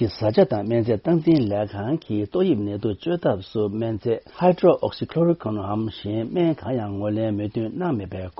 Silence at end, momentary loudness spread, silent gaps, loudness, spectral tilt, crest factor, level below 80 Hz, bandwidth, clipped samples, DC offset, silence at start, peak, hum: 0.1 s; 8 LU; none; -23 LUFS; -7.5 dB/octave; 18 dB; -54 dBFS; 5.8 kHz; under 0.1%; under 0.1%; 0 s; -4 dBFS; none